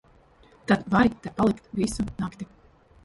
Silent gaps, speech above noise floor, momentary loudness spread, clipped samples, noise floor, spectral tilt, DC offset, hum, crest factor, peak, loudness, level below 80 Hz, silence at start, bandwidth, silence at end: none; 31 dB; 18 LU; under 0.1%; -56 dBFS; -6 dB/octave; under 0.1%; none; 20 dB; -6 dBFS; -25 LUFS; -48 dBFS; 0.7 s; 11.5 kHz; 0.6 s